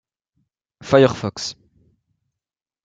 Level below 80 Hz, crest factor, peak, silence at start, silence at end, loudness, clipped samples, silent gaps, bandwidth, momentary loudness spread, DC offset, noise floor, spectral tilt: -58 dBFS; 22 dB; -2 dBFS; 0.85 s; 1.3 s; -18 LUFS; under 0.1%; none; 8.8 kHz; 16 LU; under 0.1%; -88 dBFS; -5.5 dB/octave